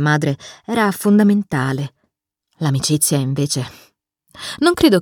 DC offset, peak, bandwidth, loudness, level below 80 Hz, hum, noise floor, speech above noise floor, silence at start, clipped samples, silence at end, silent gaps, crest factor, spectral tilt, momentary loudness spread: under 0.1%; 0 dBFS; 18.5 kHz; -17 LUFS; -50 dBFS; none; -72 dBFS; 55 dB; 0 s; under 0.1%; 0 s; none; 16 dB; -5 dB/octave; 15 LU